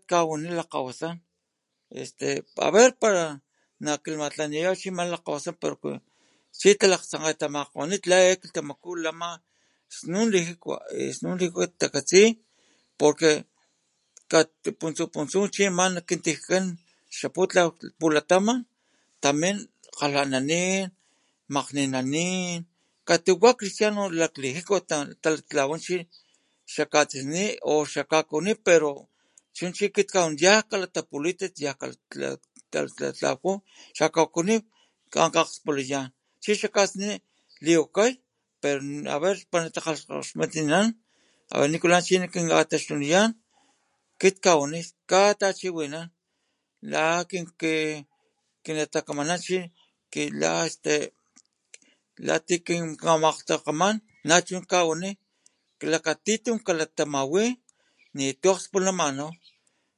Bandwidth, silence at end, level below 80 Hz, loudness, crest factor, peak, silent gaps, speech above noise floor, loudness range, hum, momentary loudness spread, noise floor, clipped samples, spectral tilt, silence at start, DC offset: 11.5 kHz; 0.65 s; -76 dBFS; -25 LUFS; 24 dB; -2 dBFS; none; 55 dB; 5 LU; none; 14 LU; -80 dBFS; under 0.1%; -3.5 dB/octave; 0.1 s; under 0.1%